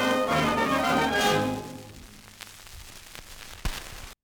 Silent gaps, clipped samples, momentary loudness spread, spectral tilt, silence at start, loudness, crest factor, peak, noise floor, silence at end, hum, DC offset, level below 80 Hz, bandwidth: none; under 0.1%; 21 LU; -4 dB/octave; 0 s; -25 LUFS; 16 dB; -12 dBFS; -47 dBFS; 0.1 s; none; under 0.1%; -44 dBFS; over 20 kHz